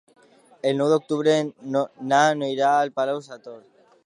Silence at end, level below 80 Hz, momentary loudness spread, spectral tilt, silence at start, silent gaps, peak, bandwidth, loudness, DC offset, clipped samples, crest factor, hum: 0.45 s; -80 dBFS; 12 LU; -5 dB/octave; 0.65 s; none; -4 dBFS; 10.5 kHz; -22 LUFS; under 0.1%; under 0.1%; 18 dB; none